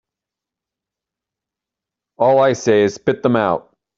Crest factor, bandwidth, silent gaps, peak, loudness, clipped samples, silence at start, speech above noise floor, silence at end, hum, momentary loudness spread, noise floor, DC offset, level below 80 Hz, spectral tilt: 18 dB; 7.8 kHz; none; -2 dBFS; -16 LUFS; under 0.1%; 2.2 s; 71 dB; 0.4 s; none; 6 LU; -86 dBFS; under 0.1%; -60 dBFS; -6 dB/octave